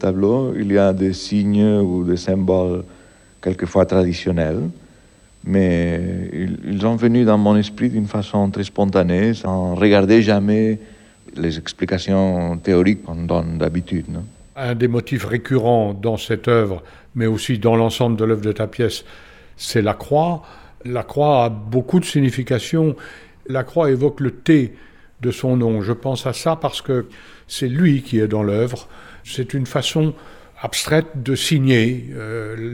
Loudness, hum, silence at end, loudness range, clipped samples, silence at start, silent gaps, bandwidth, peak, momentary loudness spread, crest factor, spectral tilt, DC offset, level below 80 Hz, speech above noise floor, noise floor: -18 LUFS; none; 0 s; 4 LU; under 0.1%; 0 s; none; 16 kHz; -4 dBFS; 11 LU; 16 dB; -6.5 dB/octave; under 0.1%; -48 dBFS; 31 dB; -49 dBFS